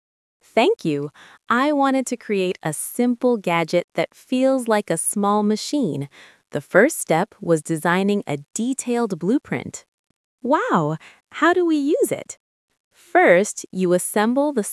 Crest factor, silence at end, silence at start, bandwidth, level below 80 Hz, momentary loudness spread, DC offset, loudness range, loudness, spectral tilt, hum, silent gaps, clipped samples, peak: 20 dB; 0 s; 0.55 s; 12 kHz; -74 dBFS; 12 LU; under 0.1%; 3 LU; -20 LUFS; -5 dB/octave; none; 3.84-3.88 s, 9.88-10.04 s, 10.16-10.38 s, 12.40-12.68 s, 12.80-12.91 s; under 0.1%; 0 dBFS